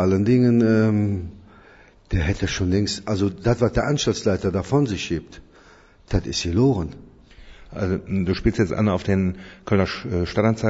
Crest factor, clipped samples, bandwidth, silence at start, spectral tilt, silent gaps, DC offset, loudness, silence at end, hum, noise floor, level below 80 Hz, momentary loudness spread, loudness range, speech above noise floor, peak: 16 dB; under 0.1%; 8 kHz; 0 s; -6.5 dB/octave; none; under 0.1%; -22 LUFS; 0 s; none; -50 dBFS; -38 dBFS; 10 LU; 3 LU; 30 dB; -4 dBFS